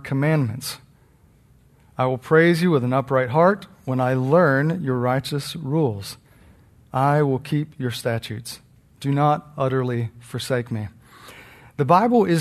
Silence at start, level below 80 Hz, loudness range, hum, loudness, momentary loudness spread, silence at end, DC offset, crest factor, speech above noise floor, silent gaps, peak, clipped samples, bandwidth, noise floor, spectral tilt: 0.05 s; -58 dBFS; 6 LU; none; -21 LUFS; 15 LU; 0 s; under 0.1%; 18 dB; 34 dB; none; -2 dBFS; under 0.1%; 13.5 kHz; -55 dBFS; -7 dB/octave